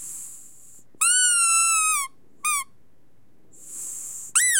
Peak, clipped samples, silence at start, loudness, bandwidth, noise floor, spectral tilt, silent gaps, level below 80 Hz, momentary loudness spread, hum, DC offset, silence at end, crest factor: -6 dBFS; under 0.1%; 0 s; -20 LUFS; 16.5 kHz; -63 dBFS; 4.5 dB/octave; none; -74 dBFS; 20 LU; none; 0.5%; 0 s; 18 dB